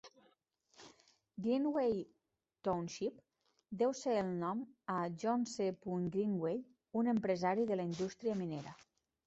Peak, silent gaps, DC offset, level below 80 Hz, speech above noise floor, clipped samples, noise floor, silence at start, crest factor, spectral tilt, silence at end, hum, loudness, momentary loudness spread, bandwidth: -22 dBFS; none; under 0.1%; -76 dBFS; 38 dB; under 0.1%; -75 dBFS; 0.05 s; 16 dB; -6.5 dB/octave; 0.5 s; none; -38 LUFS; 9 LU; 8 kHz